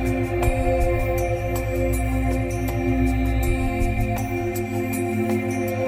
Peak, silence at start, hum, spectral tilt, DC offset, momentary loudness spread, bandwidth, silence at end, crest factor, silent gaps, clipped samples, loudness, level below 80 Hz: -6 dBFS; 0 s; none; -7 dB/octave; under 0.1%; 3 LU; 16 kHz; 0 s; 16 dB; none; under 0.1%; -23 LUFS; -28 dBFS